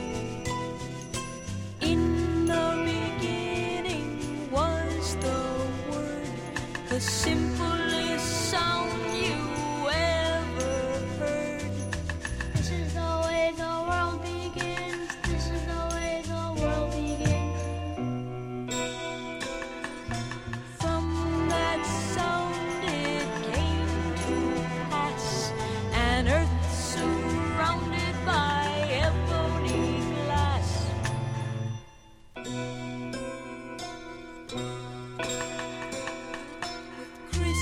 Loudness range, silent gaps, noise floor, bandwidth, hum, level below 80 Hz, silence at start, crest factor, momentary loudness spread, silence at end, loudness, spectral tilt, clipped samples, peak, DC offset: 8 LU; none; -51 dBFS; 16 kHz; none; -40 dBFS; 0 s; 18 dB; 10 LU; 0 s; -29 LUFS; -5 dB/octave; under 0.1%; -10 dBFS; under 0.1%